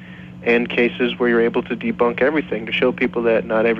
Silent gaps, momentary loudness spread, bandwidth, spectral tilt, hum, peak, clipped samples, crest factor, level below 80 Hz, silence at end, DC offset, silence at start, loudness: none; 6 LU; 6 kHz; -7.5 dB/octave; none; -6 dBFS; under 0.1%; 14 dB; -50 dBFS; 0 s; under 0.1%; 0 s; -19 LUFS